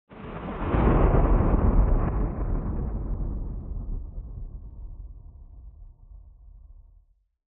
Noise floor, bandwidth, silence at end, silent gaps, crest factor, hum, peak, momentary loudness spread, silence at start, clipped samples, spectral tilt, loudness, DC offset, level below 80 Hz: -61 dBFS; 3.5 kHz; 0.75 s; none; 18 dB; none; -8 dBFS; 24 LU; 0.1 s; under 0.1%; -9 dB/octave; -27 LUFS; under 0.1%; -28 dBFS